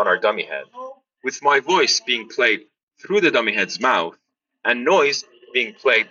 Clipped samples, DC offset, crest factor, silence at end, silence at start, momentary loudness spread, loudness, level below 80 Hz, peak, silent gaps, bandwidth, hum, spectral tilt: under 0.1%; under 0.1%; 16 dB; 0.05 s; 0 s; 13 LU; -19 LUFS; -70 dBFS; -4 dBFS; 2.83-2.88 s; 7.4 kHz; none; 0 dB/octave